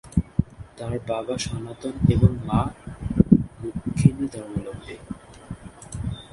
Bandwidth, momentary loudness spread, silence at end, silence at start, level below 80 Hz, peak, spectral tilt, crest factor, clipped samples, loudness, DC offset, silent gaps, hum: 11.5 kHz; 20 LU; 0.05 s; 0.05 s; -38 dBFS; 0 dBFS; -7.5 dB/octave; 24 dB; under 0.1%; -24 LUFS; under 0.1%; none; none